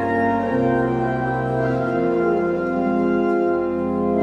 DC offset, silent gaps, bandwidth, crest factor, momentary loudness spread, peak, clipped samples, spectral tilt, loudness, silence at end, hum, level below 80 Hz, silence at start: under 0.1%; none; 6.8 kHz; 12 dB; 3 LU; -6 dBFS; under 0.1%; -9 dB/octave; -20 LUFS; 0 s; none; -46 dBFS; 0 s